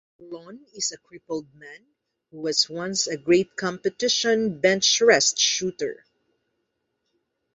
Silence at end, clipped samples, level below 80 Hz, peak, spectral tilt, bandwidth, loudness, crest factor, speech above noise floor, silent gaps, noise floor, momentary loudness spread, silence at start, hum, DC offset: 1.6 s; under 0.1%; -68 dBFS; -2 dBFS; -2 dB/octave; 8.2 kHz; -22 LUFS; 22 dB; 53 dB; none; -77 dBFS; 16 LU; 0.2 s; none; under 0.1%